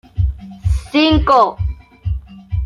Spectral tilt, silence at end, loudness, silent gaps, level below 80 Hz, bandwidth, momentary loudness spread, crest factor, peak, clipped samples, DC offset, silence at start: -7 dB/octave; 0 s; -16 LUFS; none; -24 dBFS; 11 kHz; 14 LU; 14 dB; -2 dBFS; under 0.1%; under 0.1%; 0.15 s